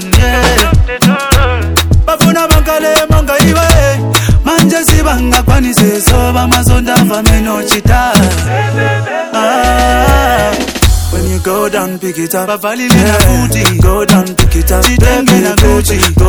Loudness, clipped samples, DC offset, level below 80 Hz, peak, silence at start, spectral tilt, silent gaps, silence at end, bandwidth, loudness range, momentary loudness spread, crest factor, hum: -9 LUFS; 3%; under 0.1%; -14 dBFS; 0 dBFS; 0 s; -4.5 dB/octave; none; 0 s; over 20 kHz; 2 LU; 5 LU; 8 dB; none